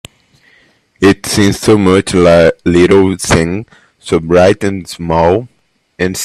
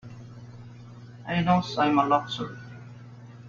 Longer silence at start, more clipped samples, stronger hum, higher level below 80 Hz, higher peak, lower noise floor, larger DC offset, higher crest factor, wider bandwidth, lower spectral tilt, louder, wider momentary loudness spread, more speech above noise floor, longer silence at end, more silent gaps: first, 1 s vs 0.05 s; neither; second, none vs 60 Hz at -40 dBFS; first, -38 dBFS vs -58 dBFS; first, 0 dBFS vs -8 dBFS; first, -50 dBFS vs -45 dBFS; neither; second, 12 dB vs 20 dB; first, 14 kHz vs 7.2 kHz; about the same, -5.5 dB/octave vs -6.5 dB/octave; first, -10 LUFS vs -25 LUFS; second, 10 LU vs 23 LU; first, 40 dB vs 21 dB; about the same, 0 s vs 0 s; neither